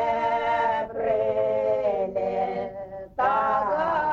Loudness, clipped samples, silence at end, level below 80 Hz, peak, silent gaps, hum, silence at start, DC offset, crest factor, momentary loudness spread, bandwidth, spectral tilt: -25 LUFS; under 0.1%; 0 s; -56 dBFS; -10 dBFS; none; none; 0 s; under 0.1%; 14 dB; 7 LU; 7.4 kHz; -6.5 dB/octave